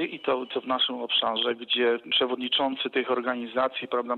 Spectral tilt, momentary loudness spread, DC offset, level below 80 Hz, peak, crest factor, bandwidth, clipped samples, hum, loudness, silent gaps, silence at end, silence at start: -5.5 dB/octave; 5 LU; under 0.1%; -74 dBFS; -14 dBFS; 14 dB; 4.5 kHz; under 0.1%; none; -26 LUFS; none; 0 s; 0 s